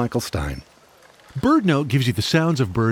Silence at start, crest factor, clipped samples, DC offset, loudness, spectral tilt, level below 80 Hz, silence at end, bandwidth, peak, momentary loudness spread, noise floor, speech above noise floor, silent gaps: 0 s; 16 dB; under 0.1%; under 0.1%; -20 LUFS; -6 dB/octave; -40 dBFS; 0 s; 17 kHz; -4 dBFS; 12 LU; -51 dBFS; 32 dB; none